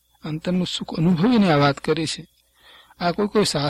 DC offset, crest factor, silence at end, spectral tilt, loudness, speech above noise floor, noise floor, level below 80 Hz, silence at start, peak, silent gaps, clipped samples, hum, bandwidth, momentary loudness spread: under 0.1%; 16 dB; 0 s; -5.5 dB/octave; -21 LUFS; 32 dB; -52 dBFS; -52 dBFS; 0.25 s; -4 dBFS; none; under 0.1%; none; 13.5 kHz; 11 LU